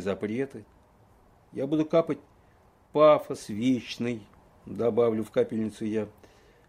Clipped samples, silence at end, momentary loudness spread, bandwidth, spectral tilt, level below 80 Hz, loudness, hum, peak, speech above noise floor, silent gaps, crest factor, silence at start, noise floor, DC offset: under 0.1%; 0.6 s; 16 LU; 15 kHz; -6.5 dB/octave; -64 dBFS; -27 LUFS; none; -8 dBFS; 33 dB; none; 20 dB; 0 s; -60 dBFS; under 0.1%